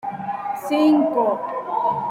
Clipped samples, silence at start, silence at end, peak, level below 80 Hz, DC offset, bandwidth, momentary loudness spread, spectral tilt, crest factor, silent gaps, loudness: under 0.1%; 0.05 s; 0 s; -6 dBFS; -68 dBFS; under 0.1%; 15.5 kHz; 11 LU; -6.5 dB/octave; 14 dB; none; -21 LUFS